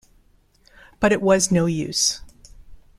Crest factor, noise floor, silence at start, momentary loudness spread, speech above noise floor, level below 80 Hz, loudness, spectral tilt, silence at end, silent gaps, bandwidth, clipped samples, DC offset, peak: 20 dB; -58 dBFS; 1 s; 5 LU; 38 dB; -48 dBFS; -19 LUFS; -3.5 dB/octave; 0.2 s; none; 14.5 kHz; under 0.1%; under 0.1%; -4 dBFS